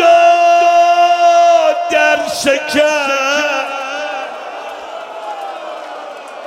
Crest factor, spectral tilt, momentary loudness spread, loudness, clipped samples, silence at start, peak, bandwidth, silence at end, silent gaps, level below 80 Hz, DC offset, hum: 12 dB; -1.5 dB/octave; 18 LU; -11 LUFS; under 0.1%; 0 s; 0 dBFS; 15 kHz; 0 s; none; -60 dBFS; under 0.1%; none